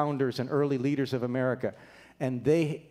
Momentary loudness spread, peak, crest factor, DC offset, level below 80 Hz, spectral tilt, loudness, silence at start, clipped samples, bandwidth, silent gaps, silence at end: 8 LU; -12 dBFS; 16 dB; under 0.1%; -68 dBFS; -7.5 dB/octave; -29 LUFS; 0 s; under 0.1%; 15 kHz; none; 0.1 s